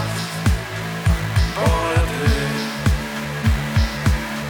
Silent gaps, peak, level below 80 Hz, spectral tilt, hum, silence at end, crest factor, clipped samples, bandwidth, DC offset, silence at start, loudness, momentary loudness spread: none; -4 dBFS; -24 dBFS; -5.5 dB/octave; none; 0 s; 14 dB; under 0.1%; over 20 kHz; under 0.1%; 0 s; -21 LUFS; 5 LU